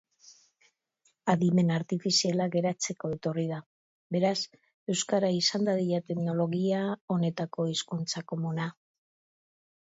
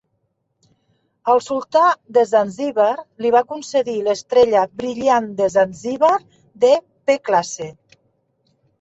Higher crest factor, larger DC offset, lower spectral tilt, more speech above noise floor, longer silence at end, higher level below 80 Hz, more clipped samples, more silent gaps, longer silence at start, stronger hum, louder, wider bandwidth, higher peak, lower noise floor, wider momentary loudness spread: about the same, 20 dB vs 16 dB; neither; about the same, -5 dB/octave vs -4 dB/octave; second, 44 dB vs 53 dB; about the same, 1.2 s vs 1.1 s; second, -72 dBFS vs -62 dBFS; neither; first, 3.66-4.10 s, 4.74-4.86 s, 7.01-7.08 s vs none; second, 0.25 s vs 1.25 s; neither; second, -29 LUFS vs -18 LUFS; about the same, 8 kHz vs 8 kHz; second, -12 dBFS vs -2 dBFS; about the same, -72 dBFS vs -70 dBFS; about the same, 9 LU vs 7 LU